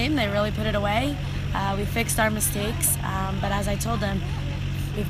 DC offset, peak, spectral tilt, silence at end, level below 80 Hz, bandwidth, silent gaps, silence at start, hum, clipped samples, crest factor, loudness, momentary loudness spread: under 0.1%; -10 dBFS; -4.5 dB/octave; 0 s; -34 dBFS; 15.5 kHz; none; 0 s; none; under 0.1%; 16 dB; -25 LUFS; 7 LU